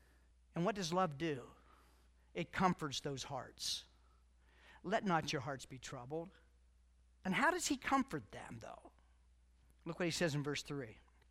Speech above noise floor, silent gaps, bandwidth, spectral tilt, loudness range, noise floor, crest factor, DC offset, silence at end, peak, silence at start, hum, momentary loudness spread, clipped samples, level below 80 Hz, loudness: 29 dB; none; 16 kHz; -4 dB/octave; 4 LU; -69 dBFS; 22 dB; under 0.1%; 0.3 s; -20 dBFS; 0.55 s; none; 16 LU; under 0.1%; -66 dBFS; -40 LUFS